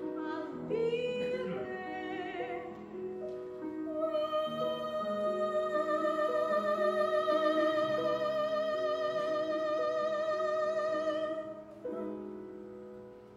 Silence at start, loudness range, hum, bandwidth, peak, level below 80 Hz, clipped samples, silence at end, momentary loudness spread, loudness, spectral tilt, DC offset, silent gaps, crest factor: 0 s; 6 LU; none; 11.5 kHz; -18 dBFS; -72 dBFS; under 0.1%; 0 s; 12 LU; -34 LUFS; -5.5 dB/octave; under 0.1%; none; 14 dB